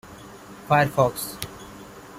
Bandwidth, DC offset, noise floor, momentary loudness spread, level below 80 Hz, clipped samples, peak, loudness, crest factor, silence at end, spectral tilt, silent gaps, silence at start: 16.5 kHz; under 0.1%; -43 dBFS; 23 LU; -54 dBFS; under 0.1%; -6 dBFS; -22 LUFS; 20 dB; 0 s; -5 dB/octave; none; 0.05 s